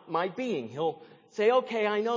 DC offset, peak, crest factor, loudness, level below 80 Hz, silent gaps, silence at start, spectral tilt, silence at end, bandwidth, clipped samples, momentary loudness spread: under 0.1%; -12 dBFS; 16 dB; -29 LUFS; -86 dBFS; none; 0.05 s; -5.5 dB/octave; 0 s; 7.6 kHz; under 0.1%; 11 LU